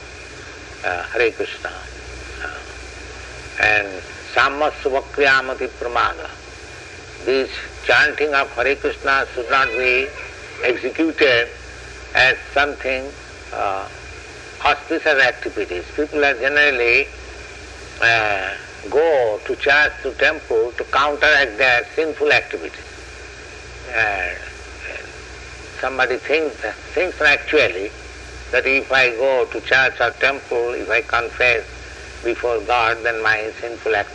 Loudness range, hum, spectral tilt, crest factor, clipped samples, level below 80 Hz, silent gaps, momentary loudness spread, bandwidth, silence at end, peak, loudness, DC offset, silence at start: 6 LU; none; -3.5 dB/octave; 18 dB; under 0.1%; -42 dBFS; none; 20 LU; 10.5 kHz; 0 s; -2 dBFS; -18 LUFS; under 0.1%; 0 s